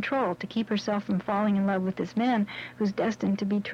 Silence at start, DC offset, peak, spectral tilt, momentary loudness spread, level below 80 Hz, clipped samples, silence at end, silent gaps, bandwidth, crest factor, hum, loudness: 0 s; under 0.1%; -16 dBFS; -7 dB/octave; 4 LU; -66 dBFS; under 0.1%; 0 s; none; 7.2 kHz; 12 dB; none; -28 LUFS